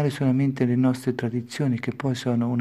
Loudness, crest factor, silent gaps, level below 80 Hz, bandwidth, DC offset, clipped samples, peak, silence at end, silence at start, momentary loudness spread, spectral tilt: -24 LUFS; 16 dB; none; -64 dBFS; 13 kHz; under 0.1%; under 0.1%; -8 dBFS; 0 s; 0 s; 5 LU; -7.5 dB/octave